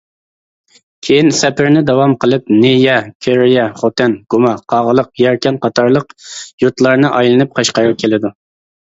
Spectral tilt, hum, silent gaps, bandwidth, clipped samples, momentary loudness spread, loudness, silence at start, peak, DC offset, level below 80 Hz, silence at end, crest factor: -5 dB/octave; none; 3.15-3.20 s, 6.53-6.58 s; 8 kHz; under 0.1%; 6 LU; -12 LUFS; 1.05 s; 0 dBFS; under 0.1%; -52 dBFS; 0.55 s; 12 dB